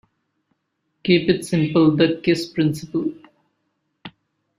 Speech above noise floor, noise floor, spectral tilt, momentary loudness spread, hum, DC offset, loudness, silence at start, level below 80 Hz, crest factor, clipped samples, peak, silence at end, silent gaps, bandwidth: 55 dB; -73 dBFS; -6.5 dB/octave; 9 LU; none; under 0.1%; -19 LUFS; 1.05 s; -58 dBFS; 20 dB; under 0.1%; -2 dBFS; 0.5 s; none; 13 kHz